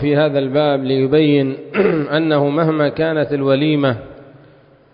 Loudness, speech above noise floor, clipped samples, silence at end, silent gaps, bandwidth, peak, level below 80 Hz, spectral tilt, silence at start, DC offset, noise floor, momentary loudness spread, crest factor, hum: -16 LUFS; 32 dB; under 0.1%; 0.7 s; none; 5.2 kHz; -4 dBFS; -52 dBFS; -12 dB/octave; 0 s; under 0.1%; -47 dBFS; 4 LU; 12 dB; none